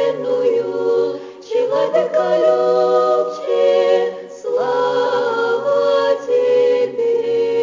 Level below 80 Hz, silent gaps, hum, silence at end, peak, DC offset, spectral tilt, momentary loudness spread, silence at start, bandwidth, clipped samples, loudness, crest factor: -68 dBFS; none; none; 0 s; -4 dBFS; under 0.1%; -5 dB/octave; 6 LU; 0 s; 7.6 kHz; under 0.1%; -17 LUFS; 14 dB